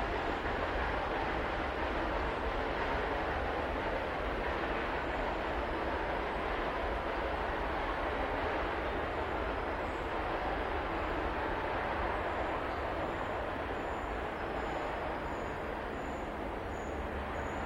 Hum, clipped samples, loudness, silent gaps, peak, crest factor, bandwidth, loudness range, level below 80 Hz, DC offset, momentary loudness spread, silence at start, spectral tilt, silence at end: none; under 0.1%; -36 LUFS; none; -22 dBFS; 14 dB; 16 kHz; 3 LU; -44 dBFS; under 0.1%; 4 LU; 0 s; -6 dB/octave; 0 s